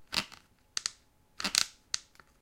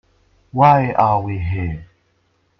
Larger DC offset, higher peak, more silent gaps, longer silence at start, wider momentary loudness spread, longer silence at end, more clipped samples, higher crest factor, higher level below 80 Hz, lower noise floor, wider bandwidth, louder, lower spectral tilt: neither; about the same, -2 dBFS vs 0 dBFS; neither; second, 0 s vs 0.55 s; second, 10 LU vs 15 LU; second, 0.4 s vs 0.75 s; neither; first, 36 dB vs 18 dB; second, -66 dBFS vs -42 dBFS; about the same, -62 dBFS vs -63 dBFS; first, 17 kHz vs 6.2 kHz; second, -33 LUFS vs -17 LUFS; second, 0.5 dB/octave vs -9.5 dB/octave